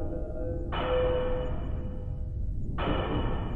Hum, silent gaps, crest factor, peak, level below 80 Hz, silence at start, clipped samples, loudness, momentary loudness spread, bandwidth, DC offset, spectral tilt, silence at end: none; none; 14 dB; -16 dBFS; -34 dBFS; 0 s; under 0.1%; -32 LUFS; 9 LU; 4.1 kHz; under 0.1%; -9 dB/octave; 0 s